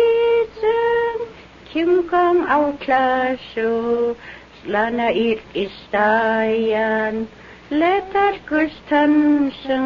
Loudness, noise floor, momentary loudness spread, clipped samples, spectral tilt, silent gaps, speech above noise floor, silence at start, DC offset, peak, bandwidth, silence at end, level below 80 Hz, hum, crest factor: -19 LUFS; -40 dBFS; 10 LU; under 0.1%; -6.5 dB/octave; none; 22 dB; 0 s; under 0.1%; -4 dBFS; 7 kHz; 0 s; -50 dBFS; none; 14 dB